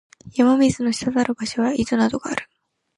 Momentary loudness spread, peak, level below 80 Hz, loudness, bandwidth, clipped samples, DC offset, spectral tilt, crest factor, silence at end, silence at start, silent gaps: 11 LU; -4 dBFS; -50 dBFS; -21 LUFS; 11.5 kHz; under 0.1%; under 0.1%; -5 dB/octave; 16 dB; 0.55 s; 0.25 s; none